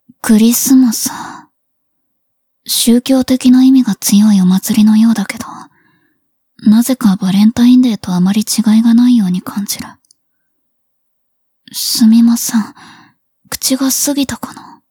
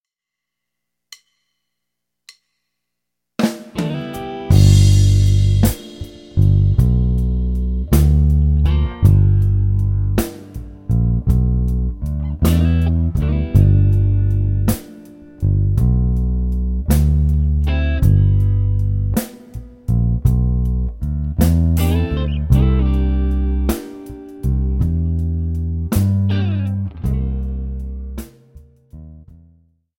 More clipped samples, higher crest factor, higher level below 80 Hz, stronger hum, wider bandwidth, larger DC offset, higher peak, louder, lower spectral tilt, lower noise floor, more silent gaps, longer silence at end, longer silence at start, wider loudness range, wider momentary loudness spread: neither; about the same, 12 dB vs 16 dB; second, -52 dBFS vs -20 dBFS; second, none vs 60 Hz at -40 dBFS; first, 20 kHz vs 17 kHz; neither; about the same, 0 dBFS vs 0 dBFS; first, -11 LUFS vs -17 LUFS; second, -4.5 dB/octave vs -7.5 dB/octave; second, -65 dBFS vs -83 dBFS; neither; second, 0.3 s vs 0.8 s; second, 0.25 s vs 3.4 s; about the same, 5 LU vs 6 LU; about the same, 15 LU vs 13 LU